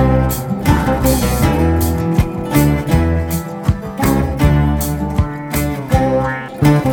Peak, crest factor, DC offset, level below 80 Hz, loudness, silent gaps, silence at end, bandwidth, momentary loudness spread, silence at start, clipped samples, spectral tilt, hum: 0 dBFS; 14 dB; under 0.1%; -22 dBFS; -16 LUFS; none; 0 s; over 20 kHz; 6 LU; 0 s; under 0.1%; -6.5 dB/octave; none